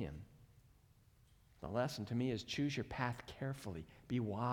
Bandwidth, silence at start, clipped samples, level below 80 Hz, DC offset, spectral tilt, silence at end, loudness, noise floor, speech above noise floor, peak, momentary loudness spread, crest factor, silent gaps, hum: 18.5 kHz; 0 s; under 0.1%; -64 dBFS; under 0.1%; -6 dB/octave; 0 s; -42 LUFS; -68 dBFS; 28 dB; -24 dBFS; 12 LU; 20 dB; none; none